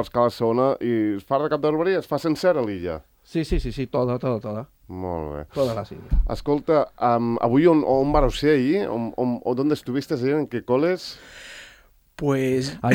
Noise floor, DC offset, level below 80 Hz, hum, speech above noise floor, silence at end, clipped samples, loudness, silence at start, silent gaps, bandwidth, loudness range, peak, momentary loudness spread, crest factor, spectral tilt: -54 dBFS; under 0.1%; -34 dBFS; none; 32 dB; 0 s; under 0.1%; -23 LUFS; 0 s; none; 16.5 kHz; 6 LU; -4 dBFS; 12 LU; 18 dB; -7 dB/octave